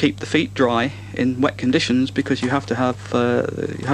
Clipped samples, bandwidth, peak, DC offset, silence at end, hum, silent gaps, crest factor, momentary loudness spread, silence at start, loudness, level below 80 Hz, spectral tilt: under 0.1%; 10.5 kHz; -4 dBFS; under 0.1%; 0 s; none; none; 16 dB; 5 LU; 0 s; -20 LUFS; -52 dBFS; -5.5 dB/octave